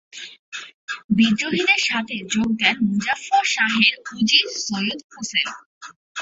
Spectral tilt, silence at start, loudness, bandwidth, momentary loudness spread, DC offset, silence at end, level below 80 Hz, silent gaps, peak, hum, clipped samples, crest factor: -2.5 dB/octave; 0.15 s; -19 LUFS; 8 kHz; 18 LU; under 0.1%; 0 s; -58 dBFS; 0.39-0.52 s, 0.74-0.87 s, 1.04-1.09 s, 5.04-5.10 s, 5.66-5.81 s, 5.96-6.15 s; 0 dBFS; none; under 0.1%; 22 dB